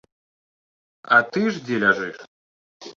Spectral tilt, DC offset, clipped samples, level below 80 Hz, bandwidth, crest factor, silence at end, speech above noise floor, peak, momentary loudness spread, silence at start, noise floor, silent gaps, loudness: -5.5 dB/octave; under 0.1%; under 0.1%; -68 dBFS; 7.6 kHz; 22 dB; 0.05 s; over 70 dB; -2 dBFS; 7 LU; 1.05 s; under -90 dBFS; 2.28-2.80 s; -20 LUFS